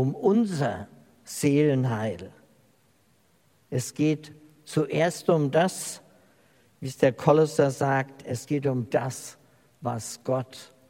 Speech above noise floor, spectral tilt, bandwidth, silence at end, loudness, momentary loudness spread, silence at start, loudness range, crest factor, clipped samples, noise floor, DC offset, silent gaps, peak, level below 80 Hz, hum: 39 dB; -6 dB/octave; 16.5 kHz; 0.25 s; -26 LUFS; 17 LU; 0 s; 5 LU; 22 dB; under 0.1%; -64 dBFS; under 0.1%; none; -4 dBFS; -70 dBFS; none